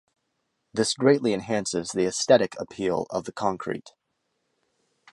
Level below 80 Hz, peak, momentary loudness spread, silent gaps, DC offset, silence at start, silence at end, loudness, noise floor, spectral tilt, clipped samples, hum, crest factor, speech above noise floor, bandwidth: -62 dBFS; -4 dBFS; 12 LU; none; under 0.1%; 0.75 s; 1.25 s; -25 LUFS; -77 dBFS; -4 dB/octave; under 0.1%; none; 22 dB; 52 dB; 11.5 kHz